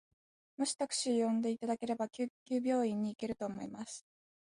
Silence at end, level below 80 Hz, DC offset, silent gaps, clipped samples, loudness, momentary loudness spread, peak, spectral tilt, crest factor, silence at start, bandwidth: 0.4 s; -76 dBFS; under 0.1%; 2.30-2.46 s; under 0.1%; -36 LUFS; 12 LU; -22 dBFS; -4 dB/octave; 14 dB; 0.6 s; 11.5 kHz